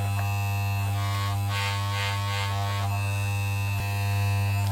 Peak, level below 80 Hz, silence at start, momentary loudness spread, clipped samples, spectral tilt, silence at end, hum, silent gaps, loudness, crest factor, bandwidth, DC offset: -16 dBFS; -52 dBFS; 0 s; 2 LU; under 0.1%; -4.5 dB/octave; 0 s; none; none; -27 LUFS; 10 dB; 16.5 kHz; under 0.1%